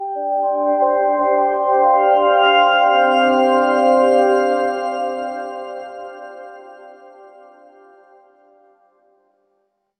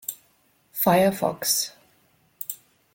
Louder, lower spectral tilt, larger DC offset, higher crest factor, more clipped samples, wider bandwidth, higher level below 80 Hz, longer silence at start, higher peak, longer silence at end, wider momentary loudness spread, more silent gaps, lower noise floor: first, -15 LUFS vs -24 LUFS; about the same, -3.5 dB/octave vs -3.5 dB/octave; neither; second, 14 dB vs 20 dB; neither; second, 9 kHz vs 17 kHz; about the same, -62 dBFS vs -64 dBFS; about the same, 0 s vs 0.1 s; first, -2 dBFS vs -6 dBFS; first, 3.05 s vs 0.4 s; about the same, 19 LU vs 18 LU; neither; first, -68 dBFS vs -64 dBFS